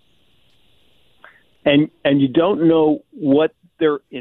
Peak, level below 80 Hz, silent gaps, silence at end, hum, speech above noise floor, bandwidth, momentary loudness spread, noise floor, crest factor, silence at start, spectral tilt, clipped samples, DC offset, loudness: -2 dBFS; -58 dBFS; none; 0 s; none; 44 dB; 4.1 kHz; 7 LU; -60 dBFS; 16 dB; 1.65 s; -10 dB/octave; under 0.1%; under 0.1%; -17 LUFS